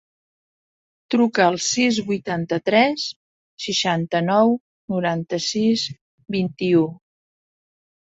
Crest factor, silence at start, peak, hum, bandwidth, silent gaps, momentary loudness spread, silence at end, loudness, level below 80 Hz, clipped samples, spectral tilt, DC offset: 20 dB; 1.1 s; -2 dBFS; none; 8 kHz; 3.16-3.57 s, 4.60-4.88 s, 6.01-6.18 s; 10 LU; 1.25 s; -21 LUFS; -64 dBFS; under 0.1%; -4.5 dB/octave; under 0.1%